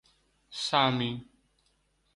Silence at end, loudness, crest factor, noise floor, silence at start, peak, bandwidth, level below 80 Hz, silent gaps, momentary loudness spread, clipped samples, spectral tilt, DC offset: 0.9 s; -28 LUFS; 22 dB; -72 dBFS; 0.5 s; -10 dBFS; 11.5 kHz; -66 dBFS; none; 17 LU; under 0.1%; -4.5 dB/octave; under 0.1%